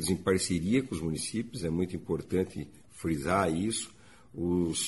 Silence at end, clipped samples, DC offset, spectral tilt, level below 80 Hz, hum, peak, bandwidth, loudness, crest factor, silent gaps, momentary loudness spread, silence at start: 0 s; under 0.1%; 0.1%; -5 dB/octave; -52 dBFS; none; -12 dBFS; 11.5 kHz; -31 LUFS; 18 dB; none; 10 LU; 0 s